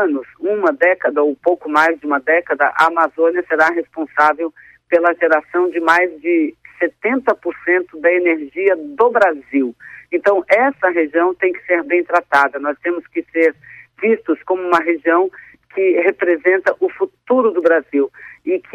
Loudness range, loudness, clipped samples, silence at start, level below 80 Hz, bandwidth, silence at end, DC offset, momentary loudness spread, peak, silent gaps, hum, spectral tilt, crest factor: 2 LU; -16 LUFS; under 0.1%; 0 s; -64 dBFS; 8.8 kHz; 0.15 s; under 0.1%; 8 LU; -2 dBFS; none; none; -5 dB/octave; 14 dB